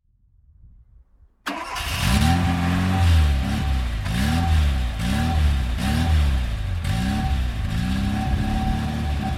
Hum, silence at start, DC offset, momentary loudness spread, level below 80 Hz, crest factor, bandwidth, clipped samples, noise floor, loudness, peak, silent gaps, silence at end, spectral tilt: none; 1.45 s; under 0.1%; 7 LU; -24 dBFS; 16 dB; 15.5 kHz; under 0.1%; -57 dBFS; -23 LUFS; -6 dBFS; none; 0 s; -5.5 dB/octave